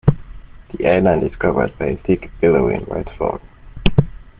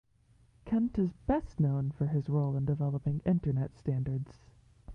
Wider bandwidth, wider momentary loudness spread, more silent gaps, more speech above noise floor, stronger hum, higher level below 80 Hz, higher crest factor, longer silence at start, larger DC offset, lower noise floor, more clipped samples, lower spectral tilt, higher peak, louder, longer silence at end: about the same, 4.9 kHz vs 5.2 kHz; first, 10 LU vs 4 LU; neither; second, 19 dB vs 34 dB; neither; first, -32 dBFS vs -50 dBFS; about the same, 18 dB vs 16 dB; second, 0.05 s vs 0.65 s; neither; second, -36 dBFS vs -65 dBFS; neither; second, -6.5 dB/octave vs -11 dB/octave; first, 0 dBFS vs -16 dBFS; first, -18 LUFS vs -32 LUFS; first, 0.15 s vs 0 s